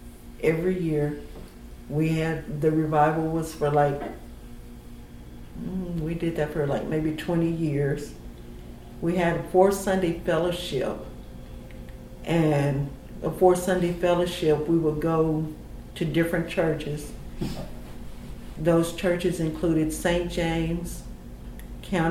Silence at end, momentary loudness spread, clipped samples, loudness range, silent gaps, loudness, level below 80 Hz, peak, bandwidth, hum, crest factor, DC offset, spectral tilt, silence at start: 0 s; 21 LU; under 0.1%; 5 LU; none; -25 LUFS; -42 dBFS; -6 dBFS; 16 kHz; 60 Hz at -50 dBFS; 20 dB; under 0.1%; -6.5 dB/octave; 0 s